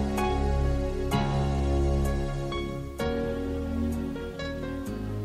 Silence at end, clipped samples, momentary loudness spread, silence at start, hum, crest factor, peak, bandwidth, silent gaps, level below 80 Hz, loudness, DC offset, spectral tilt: 0 s; under 0.1%; 7 LU; 0 s; none; 14 dB; -14 dBFS; 14.5 kHz; none; -32 dBFS; -30 LUFS; under 0.1%; -7 dB/octave